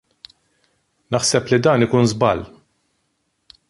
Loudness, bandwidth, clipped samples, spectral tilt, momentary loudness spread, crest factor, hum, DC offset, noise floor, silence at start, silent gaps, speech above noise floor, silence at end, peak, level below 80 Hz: -17 LUFS; 11.5 kHz; under 0.1%; -5 dB/octave; 10 LU; 18 dB; none; under 0.1%; -70 dBFS; 1.1 s; none; 53 dB; 1.25 s; -2 dBFS; -50 dBFS